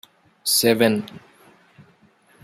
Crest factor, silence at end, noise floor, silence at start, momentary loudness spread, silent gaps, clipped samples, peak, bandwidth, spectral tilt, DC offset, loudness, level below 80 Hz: 22 dB; 1.25 s; -57 dBFS; 0.45 s; 13 LU; none; under 0.1%; -2 dBFS; 16 kHz; -3 dB/octave; under 0.1%; -19 LUFS; -66 dBFS